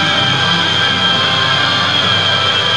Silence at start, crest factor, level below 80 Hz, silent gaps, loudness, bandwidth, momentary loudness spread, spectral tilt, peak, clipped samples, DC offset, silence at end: 0 s; 12 dB; -50 dBFS; none; -11 LUFS; 11 kHz; 1 LU; -3 dB/octave; -2 dBFS; under 0.1%; 0.8%; 0 s